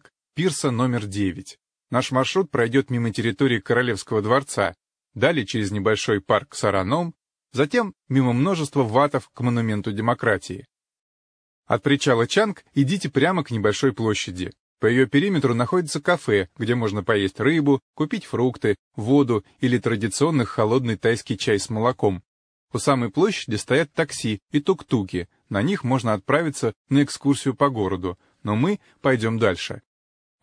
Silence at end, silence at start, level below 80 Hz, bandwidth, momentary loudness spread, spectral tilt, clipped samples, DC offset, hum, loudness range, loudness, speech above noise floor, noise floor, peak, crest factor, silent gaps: 0.65 s; 0.35 s; -58 dBFS; 10.5 kHz; 7 LU; -5.5 dB/octave; under 0.1%; under 0.1%; none; 2 LU; -22 LUFS; over 68 dB; under -90 dBFS; -4 dBFS; 18 dB; 10.99-11.63 s, 14.60-14.77 s, 17.82-17.94 s, 18.79-18.91 s, 22.27-22.68 s, 24.42-24.46 s, 26.76-26.85 s